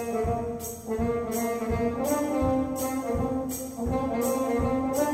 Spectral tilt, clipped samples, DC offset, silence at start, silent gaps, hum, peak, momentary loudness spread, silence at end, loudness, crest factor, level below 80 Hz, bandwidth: -6 dB/octave; under 0.1%; under 0.1%; 0 s; none; none; -14 dBFS; 5 LU; 0 s; -28 LUFS; 14 dB; -42 dBFS; 16 kHz